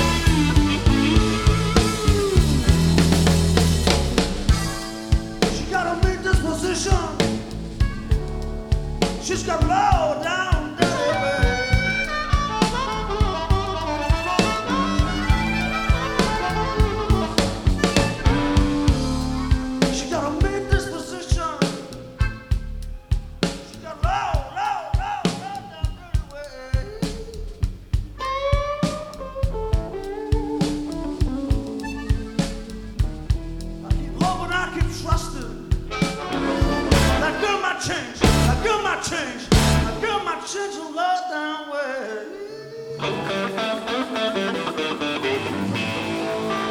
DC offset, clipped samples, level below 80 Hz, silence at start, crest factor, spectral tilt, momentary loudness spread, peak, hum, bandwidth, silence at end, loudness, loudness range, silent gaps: under 0.1%; under 0.1%; -26 dBFS; 0 s; 20 dB; -5 dB/octave; 11 LU; 0 dBFS; none; 17 kHz; 0 s; -22 LUFS; 7 LU; none